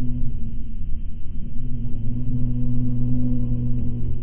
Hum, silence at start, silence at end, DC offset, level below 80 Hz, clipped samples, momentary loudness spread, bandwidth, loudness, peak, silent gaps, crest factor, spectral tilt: none; 0 s; 0 s; under 0.1%; -26 dBFS; under 0.1%; 10 LU; 1 kHz; -28 LUFS; -6 dBFS; none; 10 dB; -14 dB/octave